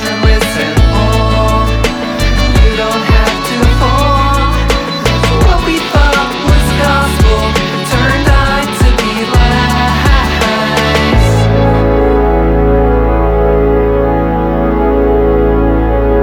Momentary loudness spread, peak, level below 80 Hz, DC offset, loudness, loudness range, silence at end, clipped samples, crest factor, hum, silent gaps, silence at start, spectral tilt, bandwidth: 3 LU; 0 dBFS; -14 dBFS; under 0.1%; -10 LUFS; 1 LU; 0 s; under 0.1%; 10 dB; none; none; 0 s; -5.5 dB/octave; 17 kHz